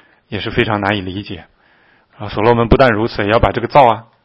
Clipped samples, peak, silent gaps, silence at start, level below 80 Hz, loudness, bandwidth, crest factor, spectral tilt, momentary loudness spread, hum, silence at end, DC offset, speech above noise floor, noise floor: 0.2%; 0 dBFS; none; 0.3 s; -30 dBFS; -14 LUFS; 7.4 kHz; 16 dB; -8 dB/octave; 17 LU; none; 0.25 s; under 0.1%; 38 dB; -52 dBFS